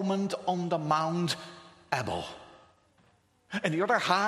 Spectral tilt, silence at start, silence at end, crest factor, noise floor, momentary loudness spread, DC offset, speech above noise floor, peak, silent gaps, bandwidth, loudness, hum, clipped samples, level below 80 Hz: -5 dB/octave; 0 s; 0 s; 22 dB; -66 dBFS; 16 LU; under 0.1%; 37 dB; -8 dBFS; none; 13.5 kHz; -30 LUFS; none; under 0.1%; -66 dBFS